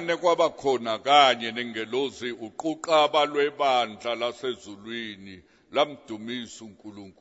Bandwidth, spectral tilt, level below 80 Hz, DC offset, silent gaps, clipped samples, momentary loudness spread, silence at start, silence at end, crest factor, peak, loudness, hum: 8 kHz; -3 dB/octave; -70 dBFS; under 0.1%; none; under 0.1%; 18 LU; 0 s; 0.1 s; 22 dB; -4 dBFS; -25 LUFS; none